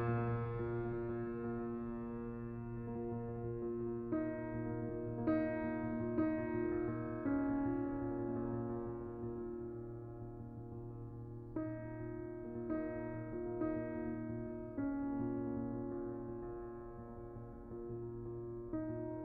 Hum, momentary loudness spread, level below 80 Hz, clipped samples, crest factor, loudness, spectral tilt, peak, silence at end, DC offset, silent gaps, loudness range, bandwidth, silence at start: none; 12 LU; -58 dBFS; under 0.1%; 16 dB; -42 LUFS; -10 dB/octave; -24 dBFS; 0 s; under 0.1%; none; 8 LU; 4.1 kHz; 0 s